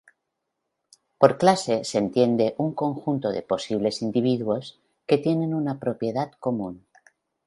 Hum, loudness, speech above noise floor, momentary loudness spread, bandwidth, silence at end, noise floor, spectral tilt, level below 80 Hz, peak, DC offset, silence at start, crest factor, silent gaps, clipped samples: none; -24 LUFS; 57 dB; 8 LU; 11.5 kHz; 0.7 s; -80 dBFS; -6 dB/octave; -64 dBFS; 0 dBFS; under 0.1%; 1.2 s; 24 dB; none; under 0.1%